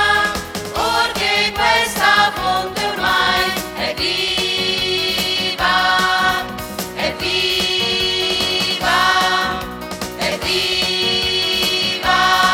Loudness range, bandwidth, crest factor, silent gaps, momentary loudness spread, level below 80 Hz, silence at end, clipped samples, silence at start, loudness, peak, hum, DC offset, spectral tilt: 1 LU; 17 kHz; 16 dB; none; 8 LU; -40 dBFS; 0 s; under 0.1%; 0 s; -16 LUFS; -2 dBFS; none; under 0.1%; -2 dB/octave